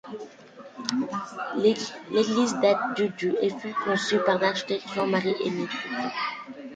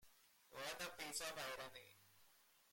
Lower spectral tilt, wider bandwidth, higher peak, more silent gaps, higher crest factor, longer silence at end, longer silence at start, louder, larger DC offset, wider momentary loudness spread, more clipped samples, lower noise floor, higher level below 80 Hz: first, -4.5 dB/octave vs -1 dB/octave; second, 9.4 kHz vs 16.5 kHz; first, -8 dBFS vs -30 dBFS; neither; about the same, 18 dB vs 22 dB; about the same, 0 s vs 0 s; about the same, 0.05 s vs 0 s; first, -26 LUFS vs -49 LUFS; neither; second, 10 LU vs 20 LU; neither; second, -47 dBFS vs -73 dBFS; first, -70 dBFS vs -80 dBFS